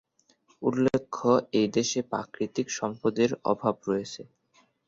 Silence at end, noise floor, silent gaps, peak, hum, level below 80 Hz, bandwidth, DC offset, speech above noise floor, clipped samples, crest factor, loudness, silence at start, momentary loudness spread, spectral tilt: 0.65 s; -66 dBFS; none; -10 dBFS; none; -66 dBFS; 7.8 kHz; under 0.1%; 39 dB; under 0.1%; 18 dB; -28 LUFS; 0.6 s; 7 LU; -5 dB/octave